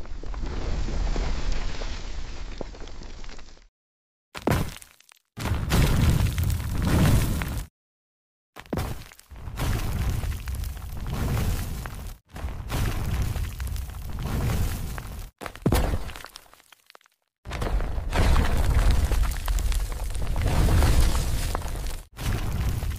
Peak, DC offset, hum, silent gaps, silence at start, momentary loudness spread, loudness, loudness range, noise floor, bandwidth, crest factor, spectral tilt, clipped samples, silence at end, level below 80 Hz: -8 dBFS; 0.2%; none; 3.69-4.32 s, 7.70-8.53 s, 17.38-17.43 s; 0 s; 18 LU; -28 LUFS; 9 LU; -57 dBFS; 16 kHz; 18 dB; -5.5 dB/octave; under 0.1%; 0 s; -28 dBFS